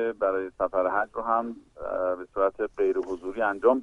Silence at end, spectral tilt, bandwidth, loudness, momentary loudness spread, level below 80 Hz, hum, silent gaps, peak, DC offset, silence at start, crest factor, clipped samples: 0 s; -7 dB/octave; 7.4 kHz; -27 LUFS; 7 LU; -58 dBFS; none; none; -8 dBFS; under 0.1%; 0 s; 18 dB; under 0.1%